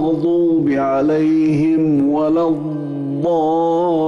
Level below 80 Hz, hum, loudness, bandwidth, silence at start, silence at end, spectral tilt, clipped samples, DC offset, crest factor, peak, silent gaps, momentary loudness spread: -52 dBFS; none; -16 LUFS; 6.8 kHz; 0 s; 0 s; -9 dB/octave; under 0.1%; under 0.1%; 6 dB; -8 dBFS; none; 6 LU